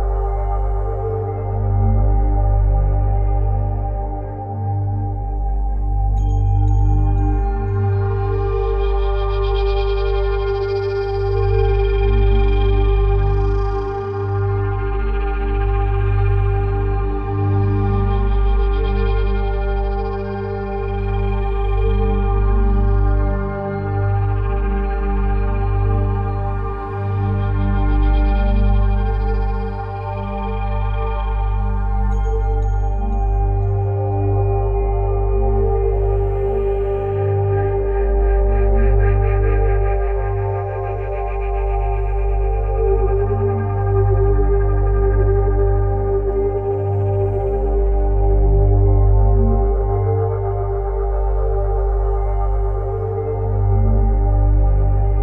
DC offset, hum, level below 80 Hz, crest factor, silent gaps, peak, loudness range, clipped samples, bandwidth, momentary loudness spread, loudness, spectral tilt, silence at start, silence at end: under 0.1%; 50 Hz at -20 dBFS; -18 dBFS; 12 dB; none; -4 dBFS; 3 LU; under 0.1%; 5.2 kHz; 6 LU; -19 LUFS; -10 dB/octave; 0 s; 0 s